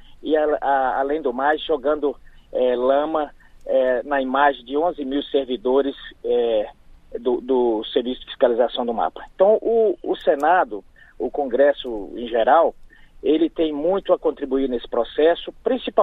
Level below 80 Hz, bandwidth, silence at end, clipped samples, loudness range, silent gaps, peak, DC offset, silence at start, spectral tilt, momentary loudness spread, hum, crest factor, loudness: -48 dBFS; 7.6 kHz; 0 s; under 0.1%; 2 LU; none; -4 dBFS; under 0.1%; 0.1 s; -6.5 dB/octave; 10 LU; none; 18 dB; -21 LUFS